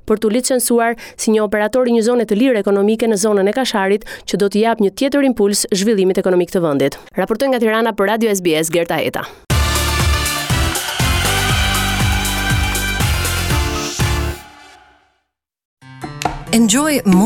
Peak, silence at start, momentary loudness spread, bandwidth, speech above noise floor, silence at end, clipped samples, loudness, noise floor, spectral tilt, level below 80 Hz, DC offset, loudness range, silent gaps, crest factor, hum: -2 dBFS; 0.05 s; 6 LU; 19 kHz; 56 dB; 0 s; under 0.1%; -16 LUFS; -71 dBFS; -4.5 dB/octave; -28 dBFS; under 0.1%; 4 LU; 15.65-15.77 s; 14 dB; none